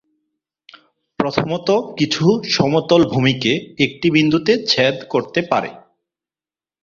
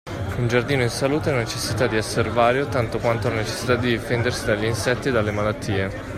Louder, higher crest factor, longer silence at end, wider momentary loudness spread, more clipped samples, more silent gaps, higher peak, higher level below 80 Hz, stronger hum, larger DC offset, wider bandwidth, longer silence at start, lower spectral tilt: first, -17 LUFS vs -22 LUFS; about the same, 18 dB vs 18 dB; first, 1.05 s vs 0 s; about the same, 6 LU vs 5 LU; neither; neither; first, 0 dBFS vs -4 dBFS; second, -54 dBFS vs -42 dBFS; neither; neither; second, 7.4 kHz vs 15 kHz; first, 1.2 s vs 0.05 s; about the same, -5.5 dB/octave vs -5 dB/octave